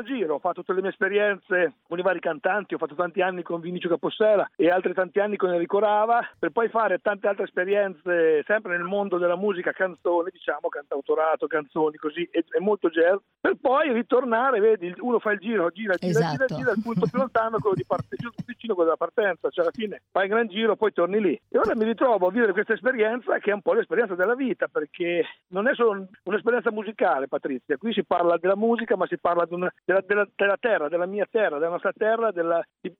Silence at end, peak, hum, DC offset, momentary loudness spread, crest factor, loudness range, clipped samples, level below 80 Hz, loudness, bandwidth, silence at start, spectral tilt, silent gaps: 0.1 s; -8 dBFS; none; under 0.1%; 6 LU; 16 dB; 3 LU; under 0.1%; -68 dBFS; -24 LUFS; 7.6 kHz; 0 s; -7 dB/octave; none